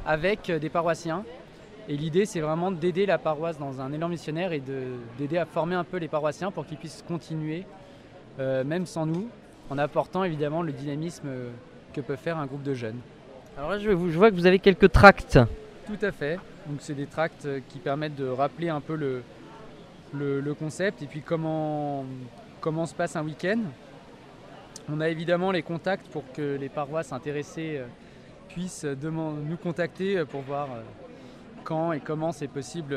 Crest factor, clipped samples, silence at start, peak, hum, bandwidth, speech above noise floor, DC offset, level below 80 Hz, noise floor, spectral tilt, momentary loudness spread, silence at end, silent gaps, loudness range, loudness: 28 dB; under 0.1%; 0 s; 0 dBFS; none; 13.5 kHz; 21 dB; under 0.1%; -46 dBFS; -48 dBFS; -6.5 dB/octave; 17 LU; 0 s; none; 12 LU; -27 LUFS